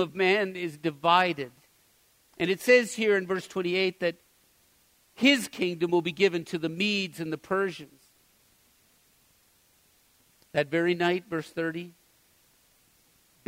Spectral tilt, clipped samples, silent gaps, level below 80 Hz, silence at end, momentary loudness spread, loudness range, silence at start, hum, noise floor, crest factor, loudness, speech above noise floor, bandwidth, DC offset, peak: -4.5 dB/octave; under 0.1%; none; -72 dBFS; 1.6 s; 11 LU; 9 LU; 0 s; none; -64 dBFS; 22 dB; -27 LUFS; 38 dB; 16 kHz; under 0.1%; -8 dBFS